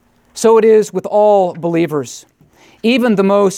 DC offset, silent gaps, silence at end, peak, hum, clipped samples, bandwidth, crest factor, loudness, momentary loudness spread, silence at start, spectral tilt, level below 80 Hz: under 0.1%; none; 0 s; 0 dBFS; none; under 0.1%; 15 kHz; 12 dB; -13 LUFS; 14 LU; 0.35 s; -5.5 dB/octave; -62 dBFS